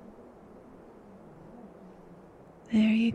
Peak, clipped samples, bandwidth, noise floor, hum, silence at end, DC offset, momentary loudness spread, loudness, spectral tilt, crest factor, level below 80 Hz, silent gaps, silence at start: -16 dBFS; under 0.1%; 8.2 kHz; -53 dBFS; none; 0 s; under 0.1%; 27 LU; -26 LUFS; -7 dB/octave; 16 dB; -64 dBFS; none; 1.55 s